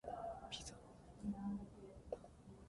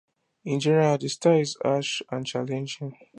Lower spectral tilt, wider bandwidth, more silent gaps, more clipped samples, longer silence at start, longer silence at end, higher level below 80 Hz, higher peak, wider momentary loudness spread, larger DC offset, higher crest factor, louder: about the same, -5 dB/octave vs -5.5 dB/octave; about the same, 11.5 kHz vs 11 kHz; neither; neither; second, 0.05 s vs 0.45 s; second, 0 s vs 0.25 s; first, -64 dBFS vs -74 dBFS; second, -32 dBFS vs -8 dBFS; first, 14 LU vs 11 LU; neither; about the same, 20 dB vs 18 dB; second, -50 LUFS vs -25 LUFS